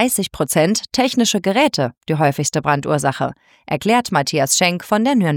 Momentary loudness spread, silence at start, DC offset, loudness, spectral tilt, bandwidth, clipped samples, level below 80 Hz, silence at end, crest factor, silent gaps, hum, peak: 6 LU; 0 s; under 0.1%; -17 LUFS; -4 dB/octave; 18 kHz; under 0.1%; -52 dBFS; 0 s; 16 dB; none; none; -2 dBFS